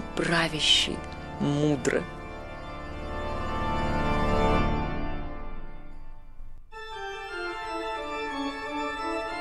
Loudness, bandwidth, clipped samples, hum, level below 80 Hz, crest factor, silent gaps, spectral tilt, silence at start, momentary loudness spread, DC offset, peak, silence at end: -28 LUFS; 12.5 kHz; under 0.1%; none; -36 dBFS; 20 dB; none; -4 dB/octave; 0 s; 16 LU; under 0.1%; -10 dBFS; 0 s